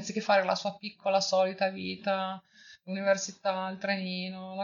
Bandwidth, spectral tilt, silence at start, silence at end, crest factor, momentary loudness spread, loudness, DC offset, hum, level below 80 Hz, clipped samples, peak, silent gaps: 7.4 kHz; -4 dB/octave; 0 s; 0 s; 18 dB; 11 LU; -30 LUFS; under 0.1%; none; -80 dBFS; under 0.1%; -12 dBFS; none